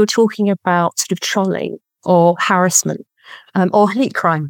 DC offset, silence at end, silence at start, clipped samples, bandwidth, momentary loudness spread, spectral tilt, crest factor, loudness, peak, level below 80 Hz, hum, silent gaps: under 0.1%; 0 s; 0 s; under 0.1%; 17.5 kHz; 11 LU; -4 dB/octave; 16 dB; -15 LUFS; 0 dBFS; -74 dBFS; none; none